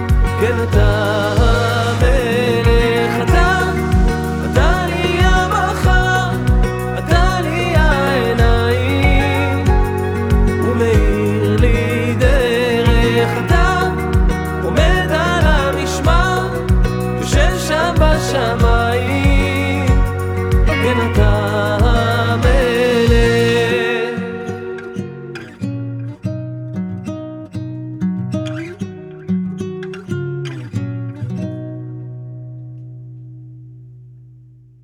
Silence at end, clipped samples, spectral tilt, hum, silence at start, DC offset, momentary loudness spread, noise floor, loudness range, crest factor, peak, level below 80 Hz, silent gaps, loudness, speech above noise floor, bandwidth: 0.7 s; under 0.1%; -6 dB/octave; none; 0 s; under 0.1%; 13 LU; -43 dBFS; 11 LU; 14 dB; -2 dBFS; -20 dBFS; none; -16 LUFS; 30 dB; 16 kHz